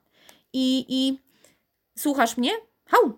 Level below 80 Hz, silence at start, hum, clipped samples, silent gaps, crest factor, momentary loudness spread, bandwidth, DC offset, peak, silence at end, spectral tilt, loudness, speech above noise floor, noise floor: -72 dBFS; 0.55 s; none; under 0.1%; none; 22 dB; 11 LU; 17 kHz; under 0.1%; -4 dBFS; 0.05 s; -2.5 dB/octave; -24 LUFS; 43 dB; -66 dBFS